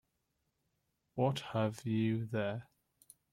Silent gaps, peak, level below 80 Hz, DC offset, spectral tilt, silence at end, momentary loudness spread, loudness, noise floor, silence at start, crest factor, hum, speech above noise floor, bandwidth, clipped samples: none; -20 dBFS; -72 dBFS; under 0.1%; -7 dB/octave; 0.7 s; 8 LU; -36 LUFS; -83 dBFS; 1.15 s; 18 dB; none; 48 dB; 15 kHz; under 0.1%